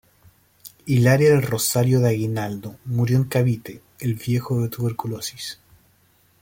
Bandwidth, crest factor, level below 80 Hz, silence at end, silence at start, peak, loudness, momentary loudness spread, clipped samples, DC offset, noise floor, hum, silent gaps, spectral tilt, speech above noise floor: 17 kHz; 18 dB; -56 dBFS; 0.85 s; 0.65 s; -4 dBFS; -21 LUFS; 16 LU; under 0.1%; under 0.1%; -60 dBFS; none; none; -6 dB/octave; 39 dB